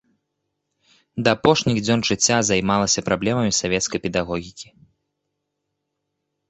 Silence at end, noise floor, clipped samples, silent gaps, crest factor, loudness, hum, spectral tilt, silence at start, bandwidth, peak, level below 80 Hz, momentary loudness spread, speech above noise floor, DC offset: 1.85 s; -78 dBFS; under 0.1%; none; 22 dB; -20 LUFS; none; -3.5 dB/octave; 1.15 s; 8.4 kHz; -2 dBFS; -50 dBFS; 11 LU; 58 dB; under 0.1%